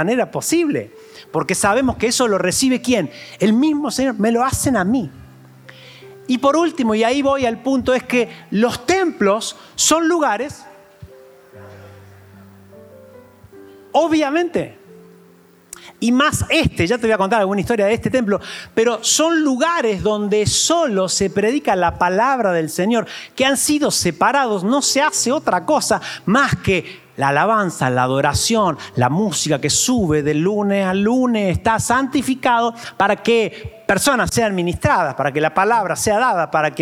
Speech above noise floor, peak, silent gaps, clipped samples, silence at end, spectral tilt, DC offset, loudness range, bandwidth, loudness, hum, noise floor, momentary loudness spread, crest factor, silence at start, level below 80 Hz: 32 dB; -2 dBFS; none; under 0.1%; 0 s; -4 dB/octave; under 0.1%; 5 LU; 16.5 kHz; -17 LUFS; none; -49 dBFS; 6 LU; 14 dB; 0 s; -46 dBFS